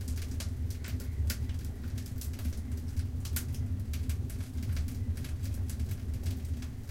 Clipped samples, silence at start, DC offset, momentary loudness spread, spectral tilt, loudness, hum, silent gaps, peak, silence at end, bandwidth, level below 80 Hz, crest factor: under 0.1%; 0 s; under 0.1%; 3 LU; -5.5 dB/octave; -37 LUFS; none; none; -16 dBFS; 0 s; 17 kHz; -38 dBFS; 18 dB